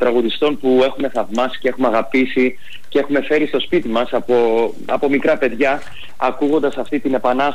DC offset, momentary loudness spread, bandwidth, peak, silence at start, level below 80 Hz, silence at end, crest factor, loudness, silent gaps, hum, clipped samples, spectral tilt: 6%; 6 LU; 15 kHz; -6 dBFS; 0 s; -54 dBFS; 0 s; 12 dB; -17 LUFS; none; none; under 0.1%; -5.5 dB/octave